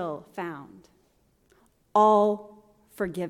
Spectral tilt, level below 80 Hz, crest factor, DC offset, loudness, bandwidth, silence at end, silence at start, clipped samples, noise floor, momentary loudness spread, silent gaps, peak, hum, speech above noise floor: -6.5 dB/octave; -66 dBFS; 18 dB; under 0.1%; -25 LUFS; 15 kHz; 0 s; 0 s; under 0.1%; -66 dBFS; 17 LU; none; -10 dBFS; none; 41 dB